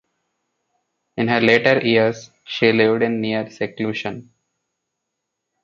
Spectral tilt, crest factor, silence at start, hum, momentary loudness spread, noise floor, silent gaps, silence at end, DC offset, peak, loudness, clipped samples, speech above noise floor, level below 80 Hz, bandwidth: -6 dB/octave; 20 dB; 1.15 s; none; 15 LU; -79 dBFS; none; 1.4 s; under 0.1%; 0 dBFS; -18 LUFS; under 0.1%; 61 dB; -62 dBFS; 7.4 kHz